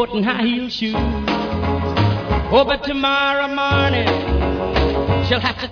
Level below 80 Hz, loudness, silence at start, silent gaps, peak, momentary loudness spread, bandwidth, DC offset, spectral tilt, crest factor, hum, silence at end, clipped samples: -28 dBFS; -18 LUFS; 0 s; none; -2 dBFS; 5 LU; 5.4 kHz; under 0.1%; -7 dB/octave; 16 dB; none; 0 s; under 0.1%